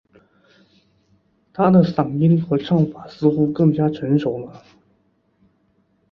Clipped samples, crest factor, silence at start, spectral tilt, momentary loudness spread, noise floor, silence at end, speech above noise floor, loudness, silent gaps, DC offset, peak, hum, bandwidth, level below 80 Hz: under 0.1%; 18 dB; 1.6 s; -10.5 dB/octave; 10 LU; -63 dBFS; 1.55 s; 46 dB; -18 LUFS; none; under 0.1%; -2 dBFS; none; 6 kHz; -56 dBFS